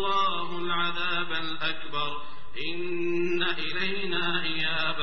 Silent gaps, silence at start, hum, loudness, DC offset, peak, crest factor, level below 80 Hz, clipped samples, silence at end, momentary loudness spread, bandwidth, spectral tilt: none; 0 s; none; -29 LUFS; 4%; -12 dBFS; 16 dB; -60 dBFS; under 0.1%; 0 s; 6 LU; 6.4 kHz; -1 dB/octave